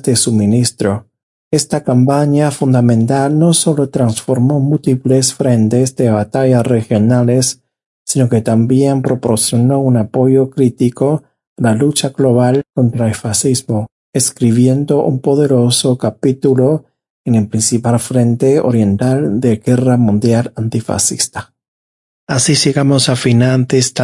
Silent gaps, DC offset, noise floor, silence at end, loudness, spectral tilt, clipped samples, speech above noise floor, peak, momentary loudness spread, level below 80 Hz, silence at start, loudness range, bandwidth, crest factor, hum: 1.23-1.51 s, 7.86-8.05 s, 11.47-11.56 s, 13.92-14.13 s, 17.10-17.24 s, 21.68-22.27 s; under 0.1%; under -90 dBFS; 0 s; -13 LUFS; -5.5 dB/octave; under 0.1%; over 78 dB; 0 dBFS; 6 LU; -52 dBFS; 0.05 s; 2 LU; 11.5 kHz; 12 dB; none